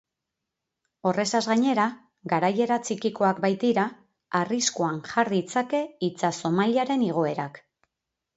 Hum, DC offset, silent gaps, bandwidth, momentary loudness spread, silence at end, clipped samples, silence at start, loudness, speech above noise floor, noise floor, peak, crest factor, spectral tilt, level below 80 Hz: none; under 0.1%; none; 8.2 kHz; 6 LU; 0.8 s; under 0.1%; 1.05 s; -25 LUFS; 60 dB; -85 dBFS; -8 dBFS; 18 dB; -4.5 dB/octave; -72 dBFS